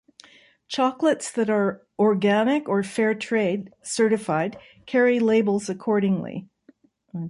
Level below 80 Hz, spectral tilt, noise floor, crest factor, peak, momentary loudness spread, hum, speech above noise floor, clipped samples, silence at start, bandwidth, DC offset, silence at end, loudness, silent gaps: -68 dBFS; -5.5 dB/octave; -58 dBFS; 14 dB; -8 dBFS; 10 LU; none; 35 dB; under 0.1%; 0.7 s; 11.5 kHz; under 0.1%; 0 s; -23 LUFS; none